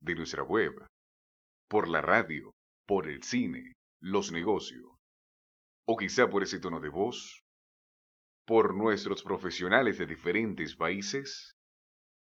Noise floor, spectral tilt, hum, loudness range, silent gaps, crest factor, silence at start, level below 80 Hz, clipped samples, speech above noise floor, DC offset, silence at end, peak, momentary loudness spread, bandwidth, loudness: under -90 dBFS; -4.5 dB/octave; none; 5 LU; 0.89-1.68 s, 2.53-2.85 s, 3.75-4.00 s, 4.99-5.83 s, 7.41-8.45 s; 26 dB; 0 s; -64 dBFS; under 0.1%; over 59 dB; under 0.1%; 0.8 s; -8 dBFS; 12 LU; 8 kHz; -31 LUFS